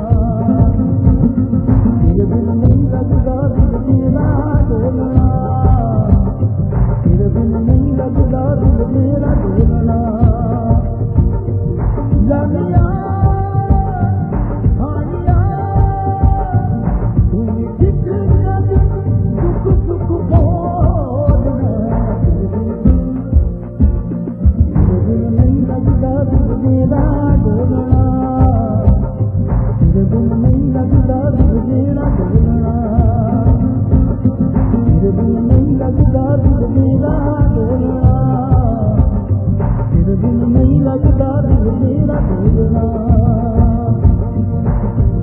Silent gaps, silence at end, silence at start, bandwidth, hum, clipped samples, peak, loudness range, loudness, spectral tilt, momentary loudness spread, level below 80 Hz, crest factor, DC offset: none; 0 s; 0 s; 2.3 kHz; none; under 0.1%; 0 dBFS; 2 LU; -14 LUFS; -14 dB/octave; 4 LU; -18 dBFS; 12 dB; under 0.1%